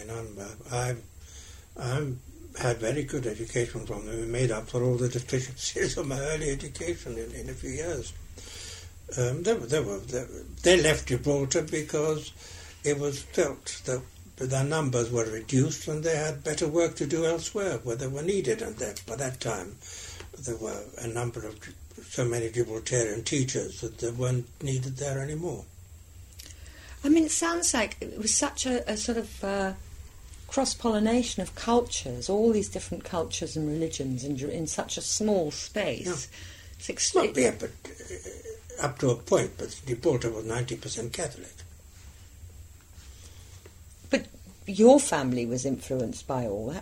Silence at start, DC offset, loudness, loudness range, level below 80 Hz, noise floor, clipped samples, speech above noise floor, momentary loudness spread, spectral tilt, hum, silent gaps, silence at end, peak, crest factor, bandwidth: 0 s; under 0.1%; -29 LUFS; 7 LU; -48 dBFS; -49 dBFS; under 0.1%; 21 dB; 19 LU; -4.5 dB/octave; none; none; 0 s; -6 dBFS; 24 dB; 16 kHz